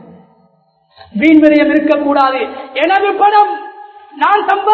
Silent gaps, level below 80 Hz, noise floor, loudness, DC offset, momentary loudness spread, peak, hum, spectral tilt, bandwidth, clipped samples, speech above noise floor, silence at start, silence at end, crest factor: none; -52 dBFS; -54 dBFS; -11 LUFS; under 0.1%; 12 LU; 0 dBFS; none; -6.5 dB/octave; 5.6 kHz; 0.3%; 44 dB; 1.15 s; 0 s; 12 dB